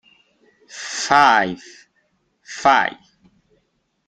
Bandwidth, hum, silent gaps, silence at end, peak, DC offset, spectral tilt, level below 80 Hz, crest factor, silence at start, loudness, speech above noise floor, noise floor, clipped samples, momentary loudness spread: 10.5 kHz; none; none; 1.15 s; 0 dBFS; under 0.1%; -2.5 dB/octave; -58 dBFS; 22 dB; 0.75 s; -17 LUFS; 52 dB; -68 dBFS; under 0.1%; 22 LU